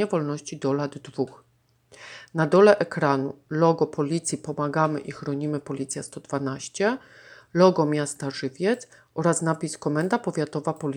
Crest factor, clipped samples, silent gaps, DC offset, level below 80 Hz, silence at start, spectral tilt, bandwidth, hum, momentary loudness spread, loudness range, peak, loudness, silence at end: 22 dB; under 0.1%; none; under 0.1%; -70 dBFS; 0 s; -5.5 dB/octave; 12.5 kHz; none; 13 LU; 5 LU; -4 dBFS; -25 LUFS; 0 s